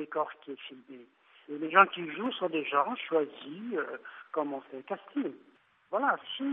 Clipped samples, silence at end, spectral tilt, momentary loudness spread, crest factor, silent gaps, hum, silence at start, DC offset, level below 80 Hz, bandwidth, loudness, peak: under 0.1%; 0 s; -1.5 dB/octave; 19 LU; 26 dB; none; none; 0 s; under 0.1%; under -90 dBFS; 3.9 kHz; -31 LUFS; -8 dBFS